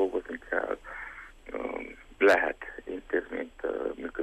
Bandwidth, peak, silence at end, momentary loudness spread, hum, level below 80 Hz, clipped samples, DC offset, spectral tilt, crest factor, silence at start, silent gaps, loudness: 13 kHz; -10 dBFS; 0 s; 18 LU; none; -56 dBFS; under 0.1%; under 0.1%; -4.5 dB/octave; 20 dB; 0 s; none; -31 LUFS